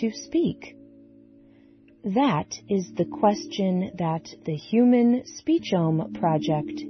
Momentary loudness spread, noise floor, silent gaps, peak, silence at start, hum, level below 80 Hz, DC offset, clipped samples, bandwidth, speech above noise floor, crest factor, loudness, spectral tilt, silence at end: 10 LU; -54 dBFS; none; -8 dBFS; 0 s; none; -62 dBFS; under 0.1%; under 0.1%; 6.4 kHz; 30 dB; 18 dB; -24 LUFS; -6.5 dB/octave; 0 s